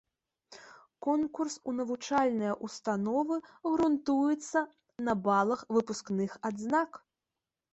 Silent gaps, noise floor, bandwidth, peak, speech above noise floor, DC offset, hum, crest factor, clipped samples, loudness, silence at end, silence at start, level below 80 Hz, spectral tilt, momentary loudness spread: none; -90 dBFS; 8.2 kHz; -16 dBFS; 59 dB; under 0.1%; none; 16 dB; under 0.1%; -32 LUFS; 0.75 s; 0.5 s; -70 dBFS; -5.5 dB/octave; 8 LU